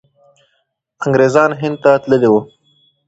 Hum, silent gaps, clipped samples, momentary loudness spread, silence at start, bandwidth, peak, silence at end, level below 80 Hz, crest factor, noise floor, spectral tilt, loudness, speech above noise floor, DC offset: none; none; under 0.1%; 5 LU; 1 s; 8 kHz; 0 dBFS; 0.6 s; -56 dBFS; 14 dB; -66 dBFS; -7 dB/octave; -13 LUFS; 54 dB; under 0.1%